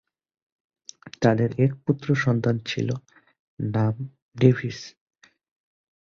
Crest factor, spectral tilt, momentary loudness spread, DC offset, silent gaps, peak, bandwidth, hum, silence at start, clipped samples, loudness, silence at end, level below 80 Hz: 22 dB; -7.5 dB/octave; 18 LU; under 0.1%; 3.39-3.57 s, 4.22-4.29 s; -4 dBFS; 7.2 kHz; none; 1.05 s; under 0.1%; -24 LUFS; 1.25 s; -58 dBFS